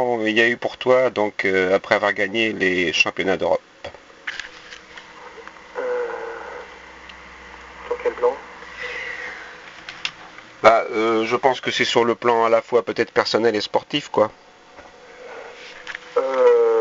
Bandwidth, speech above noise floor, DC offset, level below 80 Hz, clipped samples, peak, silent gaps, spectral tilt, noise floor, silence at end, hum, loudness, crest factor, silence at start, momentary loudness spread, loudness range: 7.8 kHz; 26 dB; under 0.1%; -58 dBFS; under 0.1%; 0 dBFS; none; -1.5 dB/octave; -45 dBFS; 0 s; none; -20 LUFS; 22 dB; 0 s; 22 LU; 13 LU